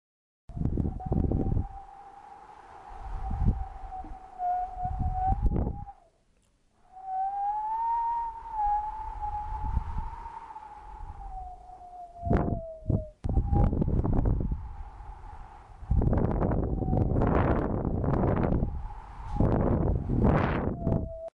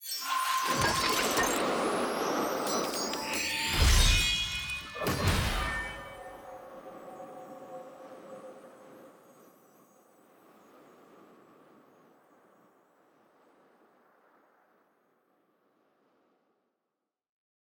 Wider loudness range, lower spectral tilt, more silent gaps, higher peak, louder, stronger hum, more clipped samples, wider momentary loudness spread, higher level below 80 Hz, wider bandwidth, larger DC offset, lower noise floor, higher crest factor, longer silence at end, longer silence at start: second, 7 LU vs 22 LU; first, -10.5 dB/octave vs -3 dB/octave; neither; about the same, -14 dBFS vs -12 dBFS; about the same, -30 LUFS vs -29 LUFS; neither; neither; second, 19 LU vs 22 LU; first, -34 dBFS vs -40 dBFS; second, 5 kHz vs over 20 kHz; neither; second, -67 dBFS vs -87 dBFS; second, 16 dB vs 22 dB; second, 0.1 s vs 8.5 s; first, 0.5 s vs 0 s